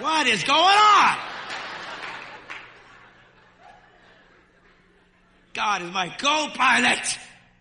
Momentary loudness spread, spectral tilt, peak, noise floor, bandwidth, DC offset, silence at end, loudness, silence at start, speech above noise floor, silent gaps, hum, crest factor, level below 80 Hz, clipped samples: 22 LU; -1 dB/octave; -6 dBFS; -58 dBFS; 11 kHz; under 0.1%; 0.35 s; -20 LUFS; 0 s; 39 dB; none; none; 18 dB; -64 dBFS; under 0.1%